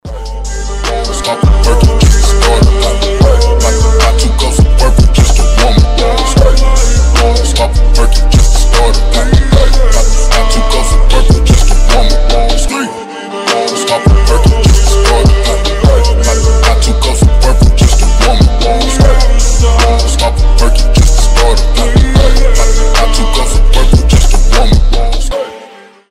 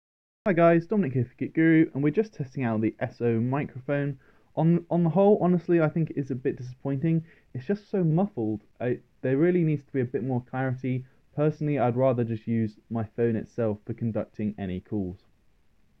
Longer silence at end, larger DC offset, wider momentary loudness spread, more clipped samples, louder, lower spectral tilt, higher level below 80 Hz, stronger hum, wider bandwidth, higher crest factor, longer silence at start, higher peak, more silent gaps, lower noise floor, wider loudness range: second, 0.45 s vs 0.85 s; first, 0.6% vs under 0.1%; second, 5 LU vs 11 LU; neither; first, -9 LUFS vs -27 LUFS; second, -4.5 dB/octave vs -10.5 dB/octave; first, -8 dBFS vs -64 dBFS; neither; first, 13.5 kHz vs 6.2 kHz; second, 6 dB vs 18 dB; second, 0.05 s vs 0.45 s; first, 0 dBFS vs -8 dBFS; neither; second, -34 dBFS vs -65 dBFS; about the same, 2 LU vs 4 LU